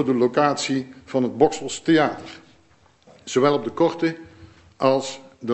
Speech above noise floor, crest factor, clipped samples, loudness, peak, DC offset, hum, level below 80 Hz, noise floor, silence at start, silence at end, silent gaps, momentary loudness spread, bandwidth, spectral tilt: 36 dB; 20 dB; under 0.1%; -21 LUFS; -2 dBFS; under 0.1%; none; -60 dBFS; -57 dBFS; 0 s; 0 s; none; 14 LU; 8.4 kHz; -5 dB/octave